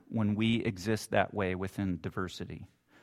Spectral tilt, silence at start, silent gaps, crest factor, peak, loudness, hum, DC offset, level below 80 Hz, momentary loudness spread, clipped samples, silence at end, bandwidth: -6 dB/octave; 0.1 s; none; 22 dB; -10 dBFS; -33 LUFS; none; under 0.1%; -60 dBFS; 11 LU; under 0.1%; 0.35 s; 14.5 kHz